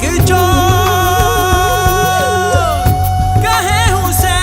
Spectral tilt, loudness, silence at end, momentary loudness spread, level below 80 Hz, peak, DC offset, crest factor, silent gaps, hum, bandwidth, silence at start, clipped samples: -4.5 dB/octave; -12 LUFS; 0 s; 3 LU; -22 dBFS; 0 dBFS; 0.2%; 12 dB; none; none; 16.5 kHz; 0 s; under 0.1%